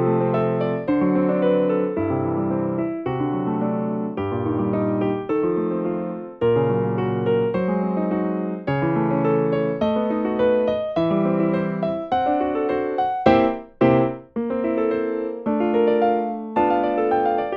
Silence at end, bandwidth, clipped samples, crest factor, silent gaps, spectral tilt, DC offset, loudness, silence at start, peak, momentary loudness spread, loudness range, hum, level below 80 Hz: 0 s; 5.8 kHz; under 0.1%; 20 dB; none; -10 dB/octave; under 0.1%; -22 LUFS; 0 s; -2 dBFS; 6 LU; 3 LU; none; -52 dBFS